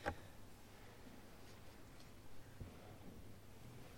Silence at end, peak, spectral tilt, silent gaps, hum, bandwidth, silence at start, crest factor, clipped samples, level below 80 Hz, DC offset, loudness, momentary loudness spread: 0 s; -26 dBFS; -5 dB/octave; none; none; 16.5 kHz; 0 s; 28 dB; under 0.1%; -64 dBFS; under 0.1%; -59 LUFS; 4 LU